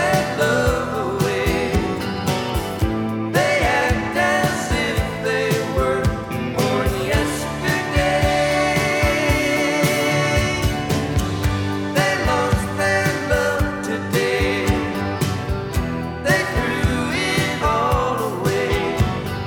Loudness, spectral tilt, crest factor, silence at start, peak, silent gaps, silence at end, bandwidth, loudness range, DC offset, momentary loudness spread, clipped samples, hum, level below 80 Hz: -20 LUFS; -5 dB/octave; 16 dB; 0 s; -4 dBFS; none; 0 s; over 20 kHz; 2 LU; under 0.1%; 5 LU; under 0.1%; none; -30 dBFS